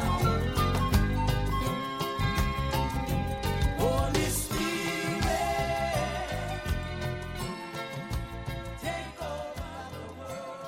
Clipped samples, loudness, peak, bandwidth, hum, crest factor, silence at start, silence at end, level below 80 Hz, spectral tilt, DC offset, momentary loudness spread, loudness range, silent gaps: under 0.1%; -31 LUFS; -12 dBFS; 16.5 kHz; none; 18 dB; 0 s; 0 s; -36 dBFS; -5 dB/octave; under 0.1%; 10 LU; 7 LU; none